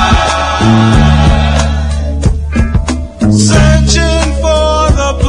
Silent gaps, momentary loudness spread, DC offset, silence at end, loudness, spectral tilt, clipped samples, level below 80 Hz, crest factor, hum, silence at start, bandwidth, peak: none; 7 LU; under 0.1%; 0 s; -10 LUFS; -5.5 dB/octave; 0.6%; -14 dBFS; 8 dB; none; 0 s; 10.5 kHz; 0 dBFS